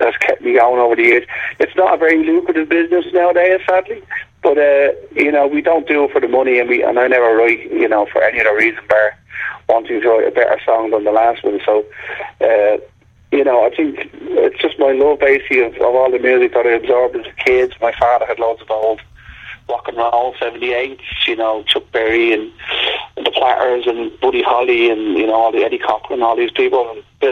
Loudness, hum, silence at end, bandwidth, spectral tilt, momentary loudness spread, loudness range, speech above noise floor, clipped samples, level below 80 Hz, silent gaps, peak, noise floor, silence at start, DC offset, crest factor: -14 LUFS; none; 0 s; 7.4 kHz; -5 dB/octave; 8 LU; 4 LU; 21 dB; under 0.1%; -50 dBFS; none; 0 dBFS; -35 dBFS; 0 s; under 0.1%; 14 dB